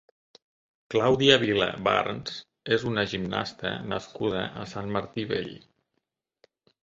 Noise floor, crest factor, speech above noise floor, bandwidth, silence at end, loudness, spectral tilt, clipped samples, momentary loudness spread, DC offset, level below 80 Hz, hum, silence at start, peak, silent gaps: -80 dBFS; 26 dB; 54 dB; 7.6 kHz; 1.25 s; -26 LUFS; -5 dB/octave; under 0.1%; 14 LU; under 0.1%; -58 dBFS; none; 0.9 s; -4 dBFS; none